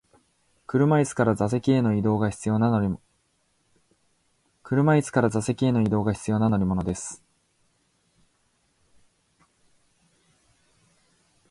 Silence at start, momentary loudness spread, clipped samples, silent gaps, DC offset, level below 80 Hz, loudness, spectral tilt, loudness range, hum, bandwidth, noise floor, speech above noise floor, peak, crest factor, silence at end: 0.7 s; 9 LU; under 0.1%; none; under 0.1%; -52 dBFS; -24 LUFS; -7 dB/octave; 6 LU; none; 11.5 kHz; -69 dBFS; 47 dB; -6 dBFS; 20 dB; 4.35 s